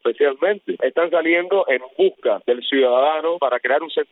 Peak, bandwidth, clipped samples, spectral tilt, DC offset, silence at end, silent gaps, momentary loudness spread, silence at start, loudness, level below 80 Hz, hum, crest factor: -6 dBFS; 4.1 kHz; under 0.1%; -7.5 dB/octave; under 0.1%; 0.1 s; none; 5 LU; 0.05 s; -19 LUFS; -82 dBFS; none; 14 dB